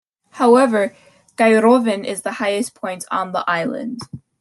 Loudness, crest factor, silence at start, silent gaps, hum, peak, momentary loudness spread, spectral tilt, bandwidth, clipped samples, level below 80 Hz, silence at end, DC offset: -17 LUFS; 16 dB; 0.35 s; none; none; -2 dBFS; 15 LU; -4.5 dB/octave; 12.5 kHz; under 0.1%; -66 dBFS; 0.25 s; under 0.1%